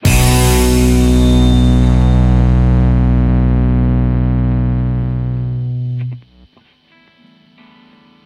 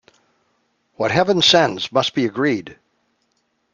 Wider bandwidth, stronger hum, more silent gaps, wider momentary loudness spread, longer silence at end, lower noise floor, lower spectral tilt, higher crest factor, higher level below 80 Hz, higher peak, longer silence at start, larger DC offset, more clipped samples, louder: first, 16.5 kHz vs 9.2 kHz; neither; neither; about the same, 9 LU vs 9 LU; first, 2.05 s vs 1 s; second, -51 dBFS vs -68 dBFS; first, -6.5 dB/octave vs -4 dB/octave; second, 12 dB vs 18 dB; first, -16 dBFS vs -58 dBFS; about the same, 0 dBFS vs -2 dBFS; second, 0 s vs 1 s; neither; neither; first, -13 LUFS vs -17 LUFS